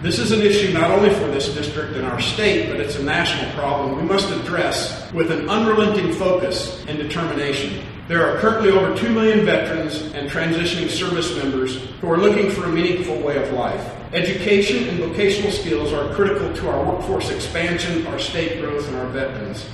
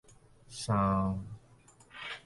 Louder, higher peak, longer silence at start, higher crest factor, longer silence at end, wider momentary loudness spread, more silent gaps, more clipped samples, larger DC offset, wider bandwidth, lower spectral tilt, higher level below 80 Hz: first, -20 LUFS vs -32 LUFS; first, -2 dBFS vs -16 dBFS; second, 0 s vs 0.5 s; about the same, 18 dB vs 18 dB; about the same, 0 s vs 0.05 s; second, 9 LU vs 22 LU; neither; neither; neither; about the same, 12.5 kHz vs 11.5 kHz; about the same, -5 dB/octave vs -6 dB/octave; first, -40 dBFS vs -54 dBFS